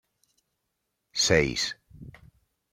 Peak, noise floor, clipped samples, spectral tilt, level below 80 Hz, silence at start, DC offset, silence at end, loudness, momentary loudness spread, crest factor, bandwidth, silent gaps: -6 dBFS; -80 dBFS; under 0.1%; -3 dB/octave; -52 dBFS; 1.15 s; under 0.1%; 0.65 s; -25 LUFS; 14 LU; 26 dB; 16 kHz; none